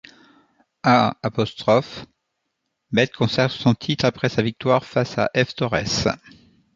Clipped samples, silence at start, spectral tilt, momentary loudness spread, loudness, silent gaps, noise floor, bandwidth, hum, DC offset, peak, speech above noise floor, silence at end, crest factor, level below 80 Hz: under 0.1%; 0.85 s; -5.5 dB/octave; 6 LU; -21 LUFS; none; -76 dBFS; 7.6 kHz; none; under 0.1%; -2 dBFS; 56 dB; 0.6 s; 20 dB; -50 dBFS